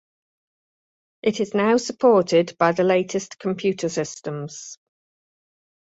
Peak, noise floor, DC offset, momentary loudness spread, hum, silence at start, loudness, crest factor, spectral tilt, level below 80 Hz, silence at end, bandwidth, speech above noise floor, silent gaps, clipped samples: -4 dBFS; under -90 dBFS; under 0.1%; 14 LU; none; 1.25 s; -21 LUFS; 18 dB; -5 dB/octave; -66 dBFS; 1.1 s; 8 kHz; over 69 dB; none; under 0.1%